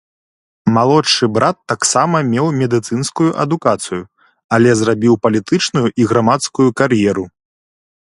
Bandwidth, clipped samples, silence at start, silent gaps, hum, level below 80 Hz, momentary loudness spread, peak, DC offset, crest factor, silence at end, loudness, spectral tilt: 11.5 kHz; under 0.1%; 0.65 s; 4.44-4.49 s; none; -52 dBFS; 7 LU; 0 dBFS; under 0.1%; 14 dB; 0.8 s; -14 LUFS; -5 dB/octave